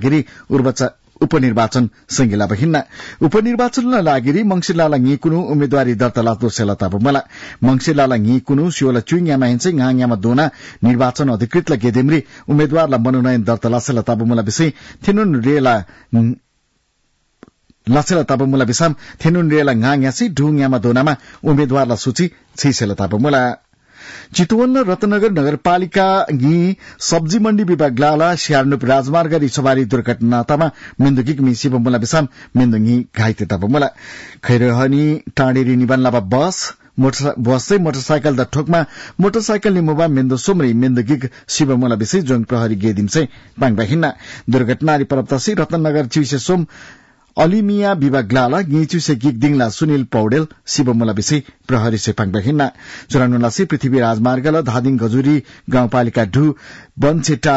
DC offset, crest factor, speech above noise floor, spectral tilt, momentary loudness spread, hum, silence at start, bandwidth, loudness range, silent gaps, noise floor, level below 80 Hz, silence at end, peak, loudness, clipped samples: under 0.1%; 12 dB; 49 dB; -6 dB/octave; 5 LU; none; 0 s; 8 kHz; 2 LU; none; -63 dBFS; -46 dBFS; 0 s; -4 dBFS; -15 LUFS; under 0.1%